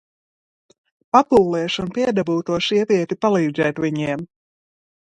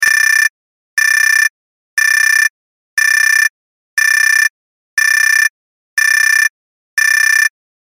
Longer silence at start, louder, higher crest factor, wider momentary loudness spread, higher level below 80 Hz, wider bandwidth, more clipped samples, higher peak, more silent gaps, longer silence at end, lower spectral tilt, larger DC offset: first, 1.15 s vs 0 s; second, -19 LUFS vs -11 LUFS; first, 20 dB vs 12 dB; about the same, 8 LU vs 8 LU; first, -54 dBFS vs -74 dBFS; second, 10.5 kHz vs 17 kHz; neither; about the same, 0 dBFS vs 0 dBFS; second, none vs 0.49-0.97 s, 1.50-1.97 s, 2.50-2.97 s, 3.50-3.97 s, 4.50-4.97 s, 5.50-5.97 s, 6.50-6.97 s; first, 0.75 s vs 0.45 s; first, -6 dB/octave vs 6.5 dB/octave; neither